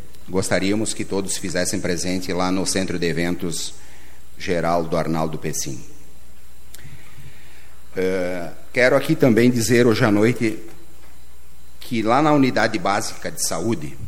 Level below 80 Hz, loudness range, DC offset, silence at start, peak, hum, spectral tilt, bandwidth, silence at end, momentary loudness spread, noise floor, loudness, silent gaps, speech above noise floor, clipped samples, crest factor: -48 dBFS; 9 LU; 5%; 0.2 s; -2 dBFS; none; -4.5 dB/octave; 16.5 kHz; 0 s; 12 LU; -48 dBFS; -21 LUFS; none; 28 dB; under 0.1%; 20 dB